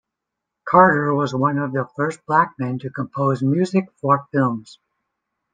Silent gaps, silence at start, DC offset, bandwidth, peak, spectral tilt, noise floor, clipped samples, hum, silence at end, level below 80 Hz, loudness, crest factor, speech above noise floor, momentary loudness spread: none; 0.65 s; under 0.1%; 9.4 kHz; -2 dBFS; -8 dB/octave; -82 dBFS; under 0.1%; none; 0.8 s; -64 dBFS; -19 LUFS; 18 dB; 63 dB; 12 LU